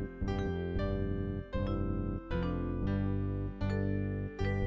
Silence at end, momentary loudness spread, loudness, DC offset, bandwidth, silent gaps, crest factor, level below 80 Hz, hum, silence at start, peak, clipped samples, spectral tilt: 0 s; 3 LU; -36 LUFS; under 0.1%; 7.4 kHz; none; 12 dB; -40 dBFS; none; 0 s; -22 dBFS; under 0.1%; -9 dB/octave